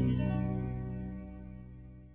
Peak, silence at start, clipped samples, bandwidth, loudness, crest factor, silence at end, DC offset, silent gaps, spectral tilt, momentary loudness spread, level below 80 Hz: -18 dBFS; 0 s; under 0.1%; 3.7 kHz; -36 LUFS; 16 dB; 0 s; under 0.1%; none; -9 dB/octave; 18 LU; -46 dBFS